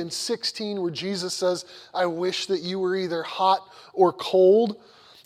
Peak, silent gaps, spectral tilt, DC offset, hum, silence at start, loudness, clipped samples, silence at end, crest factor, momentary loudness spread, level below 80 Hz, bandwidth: -6 dBFS; none; -4.5 dB/octave; under 0.1%; none; 0 s; -24 LUFS; under 0.1%; 0.5 s; 18 dB; 10 LU; -72 dBFS; 15 kHz